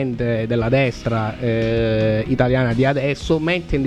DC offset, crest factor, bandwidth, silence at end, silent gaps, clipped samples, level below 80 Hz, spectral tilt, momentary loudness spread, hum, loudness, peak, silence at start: 0.2%; 14 dB; 9 kHz; 0 s; none; under 0.1%; -34 dBFS; -7.5 dB/octave; 4 LU; none; -19 LUFS; -4 dBFS; 0 s